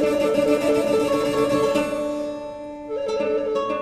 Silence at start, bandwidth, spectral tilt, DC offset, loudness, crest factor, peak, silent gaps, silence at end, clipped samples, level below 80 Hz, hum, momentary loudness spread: 0 s; 14 kHz; -5 dB/octave; under 0.1%; -22 LUFS; 14 dB; -8 dBFS; none; 0 s; under 0.1%; -50 dBFS; none; 11 LU